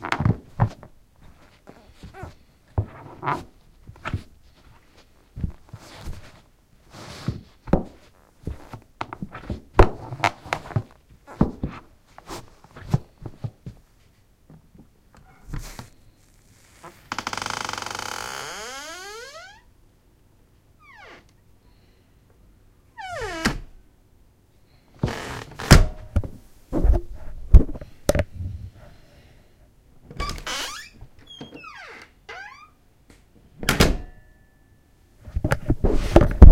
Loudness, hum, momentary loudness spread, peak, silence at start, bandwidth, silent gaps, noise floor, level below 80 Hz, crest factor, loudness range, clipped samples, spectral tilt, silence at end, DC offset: -25 LUFS; none; 25 LU; 0 dBFS; 0 s; 16.5 kHz; none; -57 dBFS; -28 dBFS; 24 dB; 15 LU; under 0.1%; -5.5 dB/octave; 0 s; under 0.1%